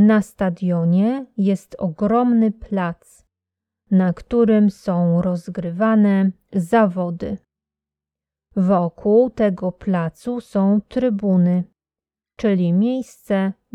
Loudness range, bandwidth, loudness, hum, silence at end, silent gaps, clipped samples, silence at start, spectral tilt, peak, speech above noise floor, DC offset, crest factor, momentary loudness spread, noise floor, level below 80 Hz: 3 LU; 11 kHz; -19 LUFS; none; 0.25 s; none; under 0.1%; 0 s; -9 dB/octave; -4 dBFS; over 72 dB; under 0.1%; 14 dB; 10 LU; under -90 dBFS; -52 dBFS